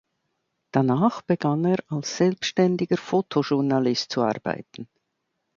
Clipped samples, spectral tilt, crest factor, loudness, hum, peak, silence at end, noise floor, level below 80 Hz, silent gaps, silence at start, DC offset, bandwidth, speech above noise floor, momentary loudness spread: under 0.1%; -6 dB/octave; 20 dB; -24 LUFS; none; -6 dBFS; 0.7 s; -77 dBFS; -68 dBFS; none; 0.75 s; under 0.1%; 7.6 kHz; 54 dB; 8 LU